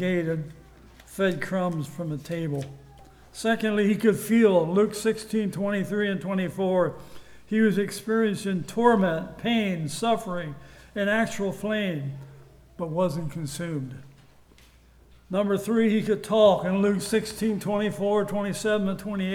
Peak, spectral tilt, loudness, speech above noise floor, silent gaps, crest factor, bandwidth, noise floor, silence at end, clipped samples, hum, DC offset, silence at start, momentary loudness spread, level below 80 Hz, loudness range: -6 dBFS; -6 dB/octave; -25 LUFS; 30 dB; none; 20 dB; 17.5 kHz; -55 dBFS; 0 s; under 0.1%; none; under 0.1%; 0 s; 13 LU; -56 dBFS; 7 LU